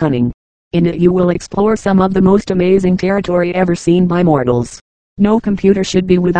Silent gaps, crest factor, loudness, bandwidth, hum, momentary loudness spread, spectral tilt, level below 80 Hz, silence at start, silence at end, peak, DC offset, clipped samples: 0.34-0.71 s, 4.81-5.16 s; 12 dB; -13 LUFS; 9.2 kHz; none; 5 LU; -7.5 dB/octave; -38 dBFS; 0 s; 0 s; 0 dBFS; under 0.1%; under 0.1%